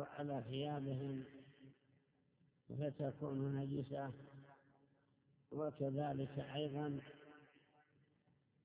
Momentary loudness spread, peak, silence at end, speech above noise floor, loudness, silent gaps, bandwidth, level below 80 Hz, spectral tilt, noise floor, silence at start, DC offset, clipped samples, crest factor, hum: 19 LU; -30 dBFS; 1.2 s; 33 dB; -45 LUFS; none; 4 kHz; -78 dBFS; -7 dB/octave; -77 dBFS; 0 s; under 0.1%; under 0.1%; 16 dB; none